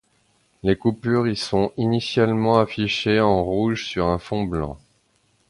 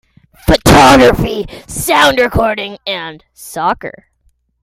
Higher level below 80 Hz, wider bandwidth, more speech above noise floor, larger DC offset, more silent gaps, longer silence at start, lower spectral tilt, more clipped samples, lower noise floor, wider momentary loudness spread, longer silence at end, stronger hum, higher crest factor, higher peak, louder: second, -44 dBFS vs -28 dBFS; second, 11.5 kHz vs 17 kHz; about the same, 43 dB vs 45 dB; neither; neither; first, 0.65 s vs 0.45 s; first, -6.5 dB/octave vs -4.5 dB/octave; neither; first, -64 dBFS vs -57 dBFS; second, 7 LU vs 17 LU; about the same, 0.75 s vs 0.75 s; neither; first, 18 dB vs 12 dB; about the same, -2 dBFS vs 0 dBFS; second, -21 LUFS vs -11 LUFS